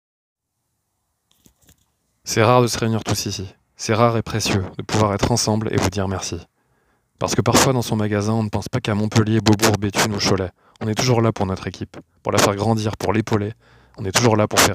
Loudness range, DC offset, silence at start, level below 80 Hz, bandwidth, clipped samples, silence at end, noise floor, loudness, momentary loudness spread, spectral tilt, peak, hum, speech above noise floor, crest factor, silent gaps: 3 LU; under 0.1%; 2.25 s; -46 dBFS; 16 kHz; under 0.1%; 0 s; -74 dBFS; -19 LUFS; 14 LU; -4.5 dB/octave; 0 dBFS; none; 55 dB; 20 dB; none